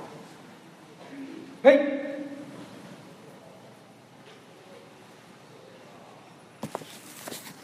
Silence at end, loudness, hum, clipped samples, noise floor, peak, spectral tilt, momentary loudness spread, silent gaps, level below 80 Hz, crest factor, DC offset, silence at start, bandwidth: 0.1 s; -26 LUFS; none; under 0.1%; -52 dBFS; -4 dBFS; -4.5 dB/octave; 27 LU; none; -82 dBFS; 28 dB; under 0.1%; 0 s; 15.5 kHz